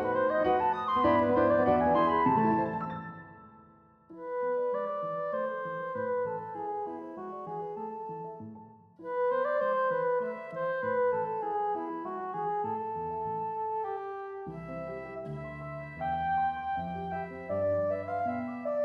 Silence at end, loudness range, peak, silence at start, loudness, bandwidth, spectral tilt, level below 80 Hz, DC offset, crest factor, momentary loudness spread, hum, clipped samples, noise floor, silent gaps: 0 s; 9 LU; -14 dBFS; 0 s; -31 LUFS; 5.4 kHz; -8.5 dB/octave; -60 dBFS; under 0.1%; 18 dB; 15 LU; none; under 0.1%; -59 dBFS; none